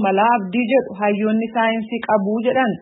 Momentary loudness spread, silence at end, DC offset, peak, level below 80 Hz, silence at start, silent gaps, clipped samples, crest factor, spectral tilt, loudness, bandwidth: 3 LU; 0 s; under 0.1%; -4 dBFS; -66 dBFS; 0 s; none; under 0.1%; 14 dB; -11 dB/octave; -18 LUFS; 4 kHz